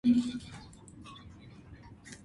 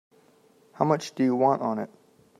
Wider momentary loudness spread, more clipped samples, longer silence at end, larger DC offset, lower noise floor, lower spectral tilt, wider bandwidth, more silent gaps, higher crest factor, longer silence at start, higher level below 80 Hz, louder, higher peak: first, 23 LU vs 10 LU; neither; second, 0.1 s vs 0.55 s; neither; second, -52 dBFS vs -60 dBFS; about the same, -5.5 dB/octave vs -6.5 dB/octave; about the same, 11.5 kHz vs 12 kHz; neither; about the same, 18 dB vs 22 dB; second, 0.05 s vs 0.8 s; first, -60 dBFS vs -76 dBFS; second, -32 LUFS vs -25 LUFS; second, -16 dBFS vs -6 dBFS